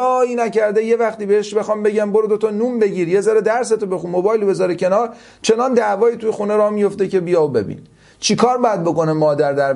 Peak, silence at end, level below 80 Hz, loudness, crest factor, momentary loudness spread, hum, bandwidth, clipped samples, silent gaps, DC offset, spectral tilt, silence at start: 0 dBFS; 0 s; -60 dBFS; -17 LUFS; 16 dB; 5 LU; none; 11.5 kHz; under 0.1%; none; under 0.1%; -5 dB/octave; 0 s